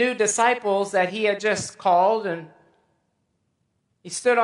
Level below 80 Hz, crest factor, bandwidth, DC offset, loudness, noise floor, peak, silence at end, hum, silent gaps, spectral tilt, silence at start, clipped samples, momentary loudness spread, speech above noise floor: -68 dBFS; 18 dB; 11.5 kHz; under 0.1%; -22 LUFS; -72 dBFS; -6 dBFS; 0 s; none; none; -3 dB/octave; 0 s; under 0.1%; 9 LU; 51 dB